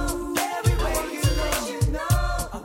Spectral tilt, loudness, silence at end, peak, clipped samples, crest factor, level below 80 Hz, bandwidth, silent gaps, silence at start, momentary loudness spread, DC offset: -4.5 dB/octave; -25 LUFS; 0 s; -8 dBFS; under 0.1%; 16 dB; -28 dBFS; 16.5 kHz; none; 0 s; 3 LU; under 0.1%